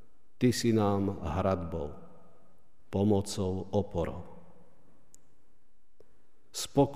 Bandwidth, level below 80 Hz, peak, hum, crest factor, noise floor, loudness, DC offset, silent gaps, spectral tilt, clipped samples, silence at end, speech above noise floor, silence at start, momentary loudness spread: 15.5 kHz; -54 dBFS; -12 dBFS; none; 20 dB; -72 dBFS; -31 LUFS; 0.6%; none; -6 dB/octave; under 0.1%; 0 s; 42 dB; 0.4 s; 15 LU